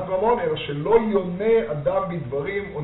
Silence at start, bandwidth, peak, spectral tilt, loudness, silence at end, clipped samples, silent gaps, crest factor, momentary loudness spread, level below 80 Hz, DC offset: 0 s; 4.1 kHz; -4 dBFS; -5.5 dB/octave; -22 LUFS; 0 s; under 0.1%; none; 18 dB; 8 LU; -48 dBFS; under 0.1%